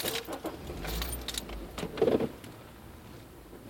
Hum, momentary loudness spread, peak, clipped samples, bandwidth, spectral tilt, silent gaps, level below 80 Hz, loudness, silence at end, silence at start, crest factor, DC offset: none; 21 LU; -12 dBFS; under 0.1%; 17 kHz; -4 dB/octave; none; -46 dBFS; -34 LUFS; 0 s; 0 s; 22 dB; under 0.1%